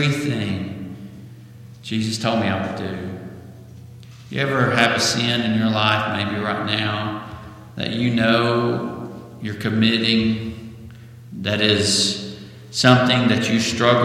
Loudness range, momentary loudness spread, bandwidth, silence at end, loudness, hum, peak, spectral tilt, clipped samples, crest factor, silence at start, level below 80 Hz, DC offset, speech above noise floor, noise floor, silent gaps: 7 LU; 20 LU; 15 kHz; 0 s; -19 LUFS; none; 0 dBFS; -4.5 dB/octave; under 0.1%; 20 dB; 0 s; -54 dBFS; under 0.1%; 22 dB; -41 dBFS; none